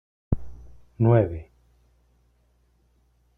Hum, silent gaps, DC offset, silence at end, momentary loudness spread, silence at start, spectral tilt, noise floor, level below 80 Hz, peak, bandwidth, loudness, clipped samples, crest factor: none; none; under 0.1%; 1.95 s; 19 LU; 0.3 s; -11.5 dB/octave; -64 dBFS; -44 dBFS; -6 dBFS; 3.6 kHz; -24 LUFS; under 0.1%; 22 dB